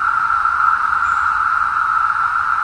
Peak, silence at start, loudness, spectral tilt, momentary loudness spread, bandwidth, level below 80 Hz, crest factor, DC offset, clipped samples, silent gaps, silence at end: -4 dBFS; 0 s; -15 LUFS; -2 dB/octave; 2 LU; 10.5 kHz; -48 dBFS; 12 dB; under 0.1%; under 0.1%; none; 0 s